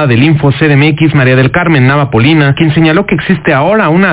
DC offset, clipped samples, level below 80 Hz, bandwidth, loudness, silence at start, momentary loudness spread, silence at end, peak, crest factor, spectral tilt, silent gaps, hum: under 0.1%; under 0.1%; -34 dBFS; 4 kHz; -7 LUFS; 0 s; 2 LU; 0 s; 0 dBFS; 6 dB; -11 dB/octave; none; none